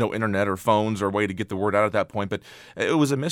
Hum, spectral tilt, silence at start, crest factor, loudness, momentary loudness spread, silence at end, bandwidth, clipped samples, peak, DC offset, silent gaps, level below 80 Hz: none; -6 dB/octave; 0 s; 18 dB; -24 LUFS; 8 LU; 0 s; 16.5 kHz; under 0.1%; -6 dBFS; under 0.1%; none; -60 dBFS